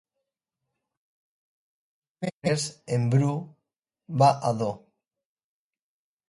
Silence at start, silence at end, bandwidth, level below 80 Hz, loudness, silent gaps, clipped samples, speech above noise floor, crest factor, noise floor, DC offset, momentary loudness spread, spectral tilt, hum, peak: 2.2 s; 1.5 s; 11.5 kHz; -68 dBFS; -26 LUFS; 2.33-2.42 s; under 0.1%; 61 dB; 22 dB; -85 dBFS; under 0.1%; 14 LU; -6 dB/octave; none; -8 dBFS